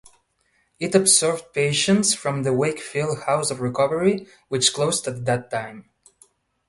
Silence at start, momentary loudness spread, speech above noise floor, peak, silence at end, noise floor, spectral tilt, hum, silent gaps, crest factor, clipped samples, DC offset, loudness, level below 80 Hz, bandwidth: 0.8 s; 12 LU; 45 dB; -2 dBFS; 0.85 s; -67 dBFS; -3.5 dB/octave; none; none; 20 dB; under 0.1%; under 0.1%; -21 LUFS; -60 dBFS; 12 kHz